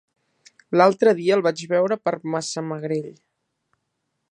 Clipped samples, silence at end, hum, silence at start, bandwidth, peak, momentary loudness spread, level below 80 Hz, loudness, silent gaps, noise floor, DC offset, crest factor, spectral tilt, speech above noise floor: under 0.1%; 1.2 s; none; 0.7 s; 11 kHz; -2 dBFS; 11 LU; -76 dBFS; -21 LUFS; none; -76 dBFS; under 0.1%; 22 dB; -5.5 dB/octave; 56 dB